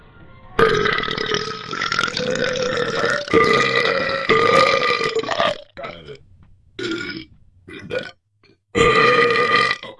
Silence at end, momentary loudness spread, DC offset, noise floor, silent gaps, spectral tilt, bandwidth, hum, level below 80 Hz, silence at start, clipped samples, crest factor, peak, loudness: 0.05 s; 16 LU; under 0.1%; -58 dBFS; none; -3.5 dB/octave; 12 kHz; none; -46 dBFS; 0.2 s; under 0.1%; 20 dB; 0 dBFS; -18 LUFS